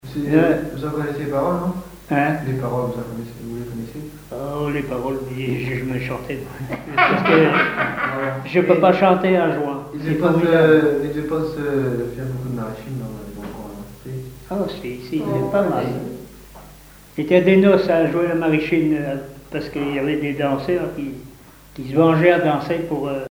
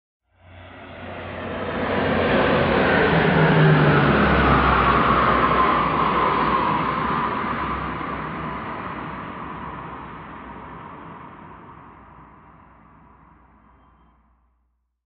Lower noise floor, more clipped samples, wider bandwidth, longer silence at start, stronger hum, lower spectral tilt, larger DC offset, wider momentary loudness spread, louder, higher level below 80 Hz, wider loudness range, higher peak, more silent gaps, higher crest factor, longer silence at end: second, -44 dBFS vs -70 dBFS; neither; first, over 20 kHz vs 5.4 kHz; second, 0.05 s vs 0.5 s; neither; second, -7.5 dB/octave vs -11 dB/octave; neither; second, 18 LU vs 21 LU; about the same, -19 LUFS vs -19 LUFS; second, -46 dBFS vs -38 dBFS; second, 9 LU vs 20 LU; first, 0 dBFS vs -4 dBFS; neither; about the same, 20 dB vs 18 dB; second, 0 s vs 2.8 s